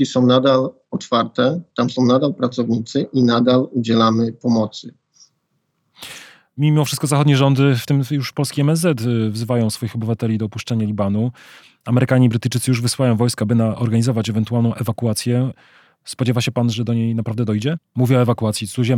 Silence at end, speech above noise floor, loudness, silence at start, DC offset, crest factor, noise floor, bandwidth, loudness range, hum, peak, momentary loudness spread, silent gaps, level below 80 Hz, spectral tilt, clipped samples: 0 s; 52 dB; -18 LUFS; 0 s; under 0.1%; 18 dB; -69 dBFS; 16 kHz; 3 LU; none; 0 dBFS; 8 LU; none; -60 dBFS; -6.5 dB/octave; under 0.1%